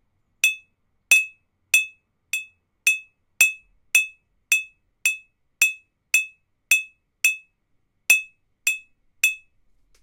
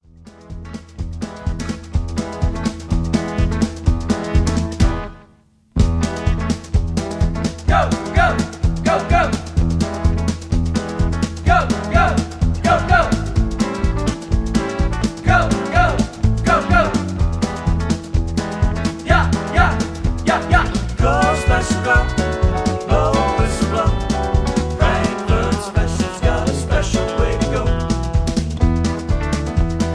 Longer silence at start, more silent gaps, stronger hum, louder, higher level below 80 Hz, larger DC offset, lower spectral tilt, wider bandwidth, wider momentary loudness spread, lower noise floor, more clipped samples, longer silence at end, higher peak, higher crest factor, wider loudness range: first, 0.45 s vs 0.2 s; neither; neither; second, -21 LUFS vs -18 LUFS; second, -70 dBFS vs -22 dBFS; neither; second, 4.5 dB/octave vs -6 dB/octave; first, 16 kHz vs 11 kHz; first, 15 LU vs 6 LU; first, -69 dBFS vs -52 dBFS; neither; first, 0.65 s vs 0 s; about the same, -4 dBFS vs -2 dBFS; first, 22 dB vs 16 dB; about the same, 2 LU vs 3 LU